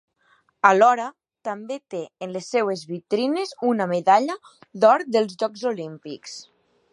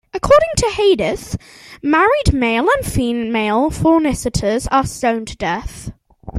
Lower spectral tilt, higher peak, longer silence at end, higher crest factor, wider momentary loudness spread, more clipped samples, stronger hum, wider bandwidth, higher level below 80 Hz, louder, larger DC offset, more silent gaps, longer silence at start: about the same, -5 dB/octave vs -5 dB/octave; about the same, -2 dBFS vs 0 dBFS; first, 0.5 s vs 0 s; first, 22 dB vs 16 dB; first, 18 LU vs 12 LU; neither; neither; second, 11.5 kHz vs 16 kHz; second, -78 dBFS vs -32 dBFS; second, -22 LUFS vs -16 LUFS; neither; neither; first, 0.65 s vs 0.15 s